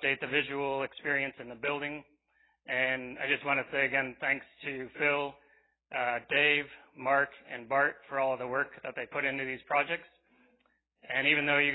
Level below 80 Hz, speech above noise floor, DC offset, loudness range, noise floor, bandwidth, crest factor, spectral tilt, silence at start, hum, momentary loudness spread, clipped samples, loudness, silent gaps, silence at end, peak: -70 dBFS; 41 dB; under 0.1%; 3 LU; -73 dBFS; 4.1 kHz; 22 dB; -7.5 dB/octave; 0 s; none; 12 LU; under 0.1%; -31 LUFS; none; 0 s; -12 dBFS